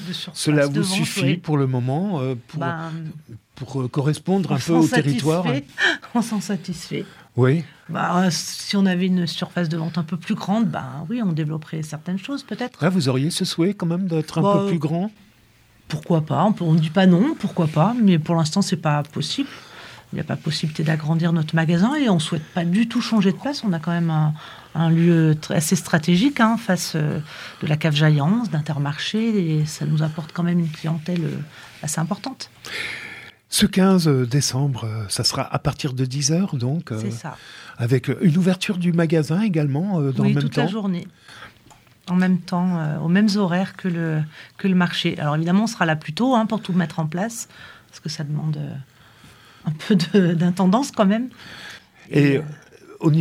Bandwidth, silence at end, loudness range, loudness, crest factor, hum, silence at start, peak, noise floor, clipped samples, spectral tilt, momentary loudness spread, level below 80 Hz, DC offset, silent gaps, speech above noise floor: 15.5 kHz; 0 s; 4 LU; -21 LUFS; 20 dB; none; 0 s; -2 dBFS; -54 dBFS; under 0.1%; -6 dB/octave; 13 LU; -58 dBFS; under 0.1%; none; 34 dB